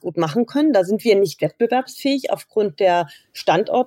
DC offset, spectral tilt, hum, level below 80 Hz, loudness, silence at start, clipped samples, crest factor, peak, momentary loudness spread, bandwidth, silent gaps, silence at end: under 0.1%; -5.5 dB/octave; none; -72 dBFS; -19 LUFS; 0.05 s; under 0.1%; 14 dB; -4 dBFS; 6 LU; 17 kHz; none; 0 s